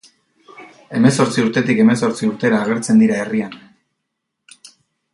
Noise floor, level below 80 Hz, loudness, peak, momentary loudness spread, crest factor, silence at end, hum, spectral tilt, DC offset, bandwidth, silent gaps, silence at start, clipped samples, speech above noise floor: -76 dBFS; -60 dBFS; -16 LUFS; 0 dBFS; 9 LU; 18 dB; 1.6 s; none; -6 dB/octave; under 0.1%; 11.5 kHz; none; 0.6 s; under 0.1%; 61 dB